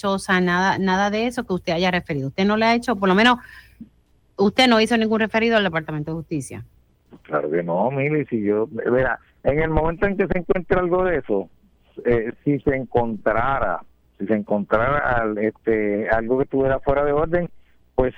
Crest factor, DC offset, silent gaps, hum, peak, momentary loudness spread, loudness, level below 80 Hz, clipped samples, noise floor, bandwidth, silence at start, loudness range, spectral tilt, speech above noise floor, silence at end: 16 dB; under 0.1%; none; none; -4 dBFS; 9 LU; -21 LUFS; -38 dBFS; under 0.1%; -59 dBFS; 14 kHz; 0.05 s; 4 LU; -6 dB/octave; 38 dB; 0.05 s